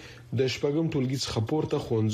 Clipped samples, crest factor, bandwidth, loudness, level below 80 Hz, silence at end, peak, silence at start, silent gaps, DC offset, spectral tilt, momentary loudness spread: under 0.1%; 14 dB; 15 kHz; -28 LUFS; -54 dBFS; 0 s; -14 dBFS; 0 s; none; under 0.1%; -6 dB/octave; 2 LU